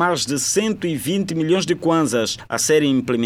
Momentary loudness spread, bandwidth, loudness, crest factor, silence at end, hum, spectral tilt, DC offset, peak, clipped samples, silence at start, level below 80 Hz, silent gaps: 5 LU; 17 kHz; -19 LUFS; 14 dB; 0 s; none; -4 dB/octave; under 0.1%; -6 dBFS; under 0.1%; 0 s; -56 dBFS; none